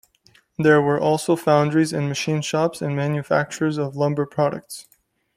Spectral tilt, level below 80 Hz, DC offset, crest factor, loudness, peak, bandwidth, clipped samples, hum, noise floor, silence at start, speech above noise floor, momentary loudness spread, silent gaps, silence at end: -6 dB/octave; -60 dBFS; under 0.1%; 18 dB; -21 LUFS; -2 dBFS; 15 kHz; under 0.1%; none; -58 dBFS; 0.6 s; 37 dB; 7 LU; none; 0.55 s